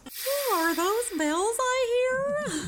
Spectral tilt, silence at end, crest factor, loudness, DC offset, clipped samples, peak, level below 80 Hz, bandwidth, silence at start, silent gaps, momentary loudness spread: -2.5 dB/octave; 0 s; 12 dB; -26 LUFS; under 0.1%; under 0.1%; -14 dBFS; -60 dBFS; over 20 kHz; 0.05 s; none; 3 LU